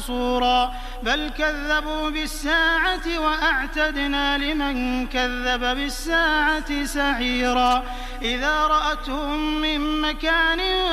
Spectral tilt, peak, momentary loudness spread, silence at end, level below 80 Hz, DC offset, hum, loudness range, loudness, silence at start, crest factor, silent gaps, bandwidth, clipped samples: -3 dB/octave; -6 dBFS; 7 LU; 0 s; -32 dBFS; under 0.1%; none; 1 LU; -22 LUFS; 0 s; 16 dB; none; 15.5 kHz; under 0.1%